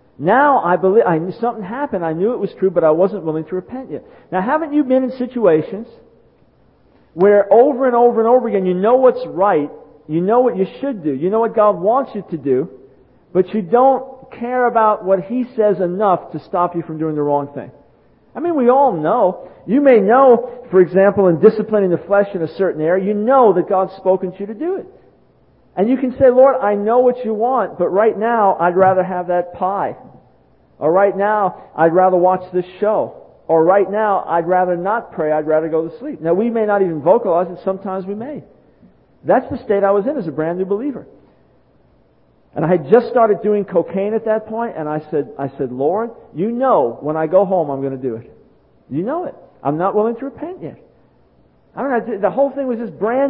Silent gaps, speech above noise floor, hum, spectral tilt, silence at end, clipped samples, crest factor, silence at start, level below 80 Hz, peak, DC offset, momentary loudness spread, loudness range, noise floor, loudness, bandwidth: none; 39 dB; none; -12 dB/octave; 0 s; under 0.1%; 16 dB; 0.2 s; -56 dBFS; 0 dBFS; under 0.1%; 13 LU; 6 LU; -55 dBFS; -16 LUFS; 5 kHz